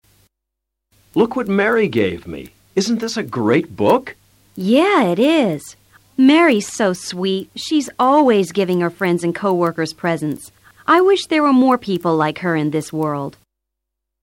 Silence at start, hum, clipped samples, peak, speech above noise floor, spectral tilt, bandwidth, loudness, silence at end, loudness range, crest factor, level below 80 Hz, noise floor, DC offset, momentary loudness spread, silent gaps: 1.15 s; none; under 0.1%; -4 dBFS; 63 dB; -5.5 dB/octave; 16.5 kHz; -17 LUFS; 0.95 s; 3 LU; 14 dB; -56 dBFS; -80 dBFS; under 0.1%; 11 LU; none